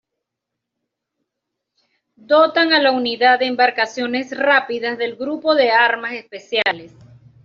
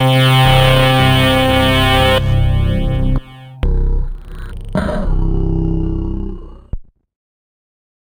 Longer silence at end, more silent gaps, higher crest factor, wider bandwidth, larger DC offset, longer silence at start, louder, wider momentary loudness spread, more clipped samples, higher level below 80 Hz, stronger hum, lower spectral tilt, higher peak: second, 0.6 s vs 1.2 s; neither; about the same, 16 dB vs 12 dB; second, 7.4 kHz vs 16.5 kHz; neither; first, 2.3 s vs 0 s; second, -17 LUFS vs -14 LUFS; second, 10 LU vs 21 LU; neither; second, -68 dBFS vs -20 dBFS; neither; second, 0.5 dB/octave vs -6 dB/octave; about the same, -2 dBFS vs -2 dBFS